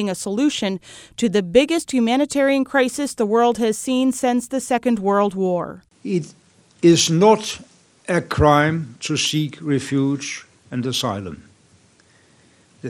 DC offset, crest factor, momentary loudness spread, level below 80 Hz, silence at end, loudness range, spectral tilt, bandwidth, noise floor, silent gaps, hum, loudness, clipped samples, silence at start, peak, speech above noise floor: under 0.1%; 18 dB; 15 LU; -46 dBFS; 0 s; 5 LU; -4.5 dB/octave; 16.5 kHz; -55 dBFS; none; none; -19 LUFS; under 0.1%; 0 s; 0 dBFS; 36 dB